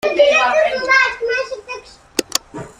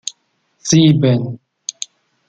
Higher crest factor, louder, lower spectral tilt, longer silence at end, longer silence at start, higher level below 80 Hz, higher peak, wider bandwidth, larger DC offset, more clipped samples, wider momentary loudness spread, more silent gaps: about the same, 16 dB vs 16 dB; about the same, -16 LUFS vs -14 LUFS; second, -1.5 dB/octave vs -5.5 dB/octave; second, 0.1 s vs 0.95 s; about the same, 0.05 s vs 0.05 s; about the same, -52 dBFS vs -54 dBFS; about the same, 0 dBFS vs 0 dBFS; first, 15.5 kHz vs 9.2 kHz; neither; neither; about the same, 16 LU vs 18 LU; neither